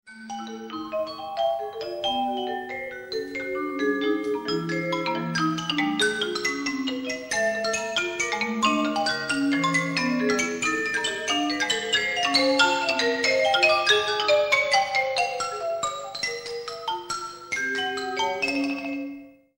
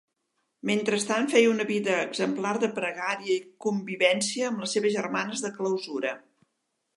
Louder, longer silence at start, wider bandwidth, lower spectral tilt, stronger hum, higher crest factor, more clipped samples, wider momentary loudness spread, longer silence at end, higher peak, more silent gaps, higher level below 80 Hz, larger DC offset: first, -24 LUFS vs -27 LUFS; second, 0.05 s vs 0.65 s; first, 16.5 kHz vs 11.5 kHz; about the same, -3 dB/octave vs -3.5 dB/octave; neither; about the same, 20 dB vs 22 dB; neither; first, 12 LU vs 8 LU; second, 0.25 s vs 0.8 s; about the same, -6 dBFS vs -6 dBFS; neither; first, -62 dBFS vs -80 dBFS; neither